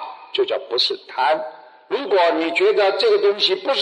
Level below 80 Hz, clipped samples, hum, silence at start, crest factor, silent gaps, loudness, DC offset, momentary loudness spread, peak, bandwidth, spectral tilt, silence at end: -80 dBFS; under 0.1%; none; 0 s; 14 dB; none; -19 LUFS; under 0.1%; 9 LU; -6 dBFS; 10 kHz; -2.5 dB/octave; 0 s